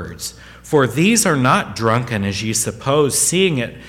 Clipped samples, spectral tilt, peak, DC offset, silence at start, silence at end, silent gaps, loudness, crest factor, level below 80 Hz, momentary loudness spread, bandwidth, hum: under 0.1%; -4 dB/octave; -2 dBFS; under 0.1%; 0 s; 0 s; none; -16 LUFS; 16 dB; -46 dBFS; 7 LU; 17 kHz; none